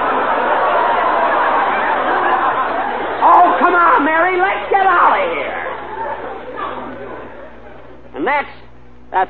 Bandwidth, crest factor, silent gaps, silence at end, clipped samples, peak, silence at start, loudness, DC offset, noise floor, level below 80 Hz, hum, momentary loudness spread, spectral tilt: 4.7 kHz; 14 dB; none; 0 s; under 0.1%; 0 dBFS; 0 s; -14 LUFS; 2%; -42 dBFS; -48 dBFS; none; 16 LU; -7 dB/octave